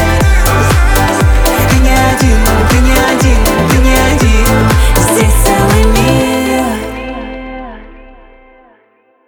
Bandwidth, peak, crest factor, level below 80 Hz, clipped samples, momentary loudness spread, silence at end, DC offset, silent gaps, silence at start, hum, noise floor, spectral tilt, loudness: over 20 kHz; 0 dBFS; 10 dB; -12 dBFS; under 0.1%; 12 LU; 1.25 s; under 0.1%; none; 0 s; none; -51 dBFS; -5 dB/octave; -9 LUFS